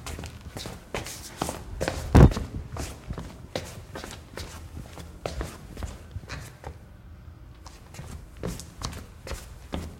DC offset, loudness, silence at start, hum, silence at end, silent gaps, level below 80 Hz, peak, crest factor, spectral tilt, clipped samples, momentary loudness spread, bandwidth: under 0.1%; -30 LUFS; 0 s; none; 0 s; none; -34 dBFS; 0 dBFS; 30 dB; -6 dB/octave; under 0.1%; 15 LU; 16.5 kHz